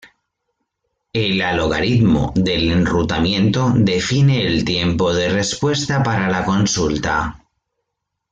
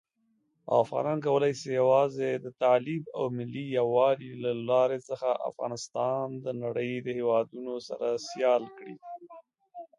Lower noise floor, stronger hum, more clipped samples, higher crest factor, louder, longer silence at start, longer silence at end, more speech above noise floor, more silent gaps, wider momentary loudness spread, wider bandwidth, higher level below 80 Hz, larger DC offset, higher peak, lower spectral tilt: first, -78 dBFS vs -74 dBFS; neither; neither; about the same, 14 dB vs 18 dB; first, -17 LUFS vs -29 LUFS; first, 1.15 s vs 0.65 s; first, 0.95 s vs 0.15 s; first, 61 dB vs 45 dB; neither; second, 4 LU vs 12 LU; second, 9.4 kHz vs 10.5 kHz; first, -38 dBFS vs -76 dBFS; neither; first, -4 dBFS vs -10 dBFS; about the same, -5 dB/octave vs -6 dB/octave